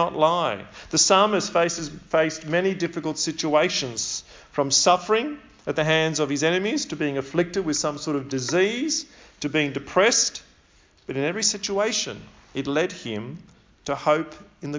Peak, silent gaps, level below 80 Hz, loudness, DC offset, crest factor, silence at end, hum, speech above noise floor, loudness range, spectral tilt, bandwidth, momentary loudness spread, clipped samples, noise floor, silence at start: -4 dBFS; none; -58 dBFS; -23 LUFS; under 0.1%; 20 dB; 0 s; none; 34 dB; 4 LU; -3 dB/octave; 7.8 kHz; 14 LU; under 0.1%; -57 dBFS; 0 s